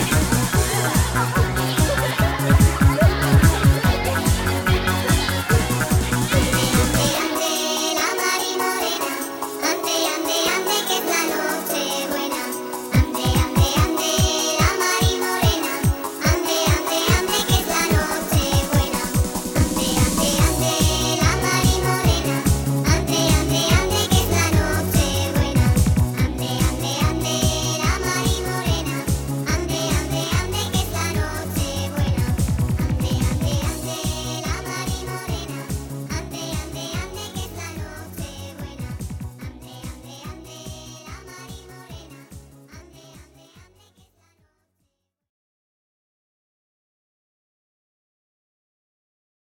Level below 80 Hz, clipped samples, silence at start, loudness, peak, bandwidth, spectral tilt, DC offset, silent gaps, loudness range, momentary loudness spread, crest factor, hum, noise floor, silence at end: -30 dBFS; under 0.1%; 0 s; -20 LUFS; -2 dBFS; 17.5 kHz; -4 dB/octave; under 0.1%; none; 14 LU; 14 LU; 20 dB; none; -74 dBFS; 6.2 s